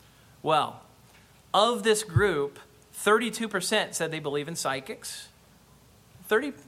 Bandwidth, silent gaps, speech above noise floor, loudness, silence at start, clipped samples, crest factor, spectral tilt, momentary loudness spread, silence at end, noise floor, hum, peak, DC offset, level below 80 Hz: 16 kHz; none; 30 dB; -27 LUFS; 0.45 s; under 0.1%; 20 dB; -3.5 dB/octave; 13 LU; 0.05 s; -57 dBFS; none; -10 dBFS; under 0.1%; -58 dBFS